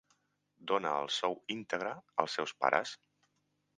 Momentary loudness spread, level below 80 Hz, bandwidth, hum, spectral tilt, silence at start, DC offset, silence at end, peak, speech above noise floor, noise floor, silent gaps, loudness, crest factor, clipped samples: 11 LU; -84 dBFS; 9.6 kHz; 50 Hz at -70 dBFS; -3 dB/octave; 0.6 s; under 0.1%; 0.85 s; -10 dBFS; 44 dB; -79 dBFS; none; -35 LUFS; 28 dB; under 0.1%